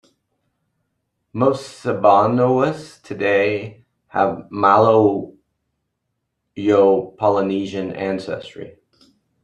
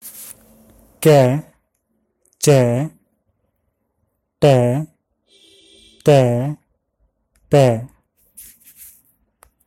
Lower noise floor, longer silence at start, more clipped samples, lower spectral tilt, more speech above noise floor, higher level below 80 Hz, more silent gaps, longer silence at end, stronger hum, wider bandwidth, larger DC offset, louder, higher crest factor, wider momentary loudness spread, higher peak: first, -75 dBFS vs -70 dBFS; first, 1.35 s vs 0.05 s; neither; about the same, -7 dB/octave vs -6.5 dB/octave; about the same, 58 dB vs 57 dB; second, -62 dBFS vs -52 dBFS; neither; second, 0.75 s vs 1.25 s; neither; second, 11 kHz vs 16.5 kHz; neither; about the same, -18 LUFS vs -16 LUFS; about the same, 18 dB vs 20 dB; about the same, 19 LU vs 21 LU; about the same, -2 dBFS vs 0 dBFS